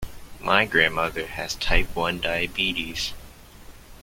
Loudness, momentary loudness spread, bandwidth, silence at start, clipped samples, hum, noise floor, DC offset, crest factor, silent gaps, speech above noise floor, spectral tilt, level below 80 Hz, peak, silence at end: -24 LUFS; 11 LU; 16.5 kHz; 0 s; under 0.1%; none; -45 dBFS; under 0.1%; 24 dB; none; 21 dB; -3 dB/octave; -34 dBFS; 0 dBFS; 0 s